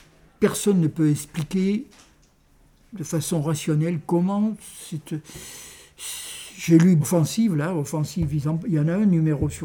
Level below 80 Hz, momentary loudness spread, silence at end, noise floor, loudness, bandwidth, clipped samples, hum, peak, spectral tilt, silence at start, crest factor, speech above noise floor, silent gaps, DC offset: -48 dBFS; 16 LU; 0 s; -57 dBFS; -23 LUFS; 19.5 kHz; under 0.1%; none; -4 dBFS; -6.5 dB/octave; 0.4 s; 18 dB; 35 dB; none; under 0.1%